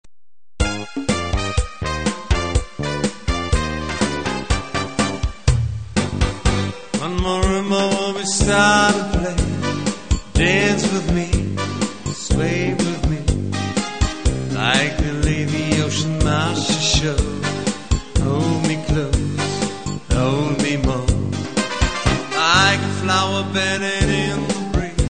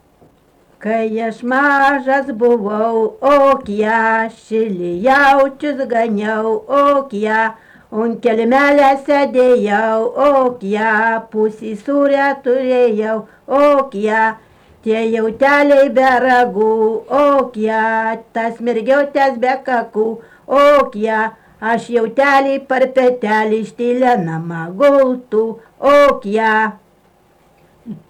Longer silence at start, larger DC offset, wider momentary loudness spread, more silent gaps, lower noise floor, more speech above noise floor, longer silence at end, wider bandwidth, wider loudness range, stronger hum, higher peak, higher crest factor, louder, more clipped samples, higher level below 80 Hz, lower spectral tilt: second, 0.05 s vs 0.8 s; first, 1% vs under 0.1%; about the same, 7 LU vs 9 LU; neither; first, under -90 dBFS vs -52 dBFS; first, over 73 dB vs 38 dB; about the same, 0 s vs 0.1 s; second, 9.4 kHz vs 11.5 kHz; about the same, 4 LU vs 2 LU; neither; first, 0 dBFS vs -4 dBFS; first, 20 dB vs 10 dB; second, -20 LUFS vs -14 LUFS; neither; first, -26 dBFS vs -52 dBFS; second, -4.5 dB/octave vs -6 dB/octave